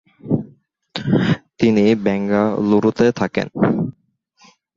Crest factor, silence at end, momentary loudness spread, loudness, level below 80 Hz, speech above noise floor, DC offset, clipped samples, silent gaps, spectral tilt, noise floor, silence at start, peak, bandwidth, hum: 16 dB; 0.85 s; 8 LU; -18 LUFS; -50 dBFS; 43 dB; under 0.1%; under 0.1%; none; -7.5 dB/octave; -59 dBFS; 0.25 s; -2 dBFS; 7.4 kHz; none